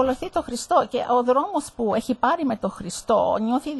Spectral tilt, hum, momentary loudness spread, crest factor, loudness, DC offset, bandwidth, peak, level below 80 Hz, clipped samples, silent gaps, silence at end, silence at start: -4.5 dB/octave; none; 7 LU; 16 dB; -23 LUFS; under 0.1%; 12 kHz; -6 dBFS; -52 dBFS; under 0.1%; none; 0 s; 0 s